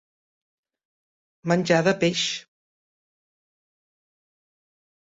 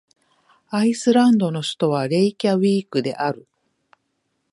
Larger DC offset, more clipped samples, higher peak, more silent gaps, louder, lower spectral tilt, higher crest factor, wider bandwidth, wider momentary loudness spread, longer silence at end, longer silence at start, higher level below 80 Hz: neither; neither; about the same, -6 dBFS vs -4 dBFS; neither; about the same, -22 LUFS vs -20 LUFS; second, -4.5 dB/octave vs -6 dB/octave; first, 22 dB vs 16 dB; second, 8 kHz vs 11.5 kHz; first, 13 LU vs 10 LU; first, 2.6 s vs 1.15 s; first, 1.45 s vs 0.7 s; about the same, -68 dBFS vs -70 dBFS